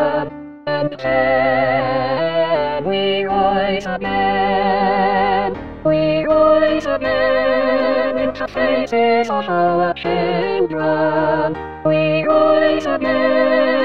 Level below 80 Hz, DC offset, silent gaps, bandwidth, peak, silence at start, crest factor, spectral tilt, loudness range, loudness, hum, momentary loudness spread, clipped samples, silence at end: -46 dBFS; 1%; none; 7.2 kHz; -2 dBFS; 0 s; 14 dB; -7 dB/octave; 2 LU; -17 LUFS; none; 6 LU; under 0.1%; 0 s